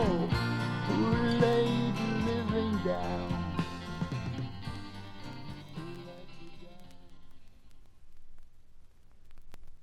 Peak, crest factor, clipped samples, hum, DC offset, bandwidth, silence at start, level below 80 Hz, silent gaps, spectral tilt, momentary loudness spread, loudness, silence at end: -12 dBFS; 20 dB; under 0.1%; none; under 0.1%; 13.5 kHz; 0 s; -48 dBFS; none; -7 dB/octave; 20 LU; -32 LUFS; 0 s